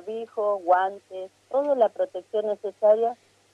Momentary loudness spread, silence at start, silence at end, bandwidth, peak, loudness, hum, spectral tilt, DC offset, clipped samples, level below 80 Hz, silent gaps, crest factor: 16 LU; 0.05 s; 0.4 s; 9 kHz; -8 dBFS; -25 LUFS; none; -5.5 dB/octave; under 0.1%; under 0.1%; -84 dBFS; none; 16 dB